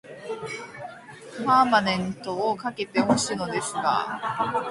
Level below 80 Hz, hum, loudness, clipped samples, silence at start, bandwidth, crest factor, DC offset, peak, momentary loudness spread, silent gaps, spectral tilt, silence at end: -60 dBFS; none; -25 LUFS; under 0.1%; 0.05 s; 11.5 kHz; 20 dB; under 0.1%; -6 dBFS; 18 LU; none; -4 dB/octave; 0 s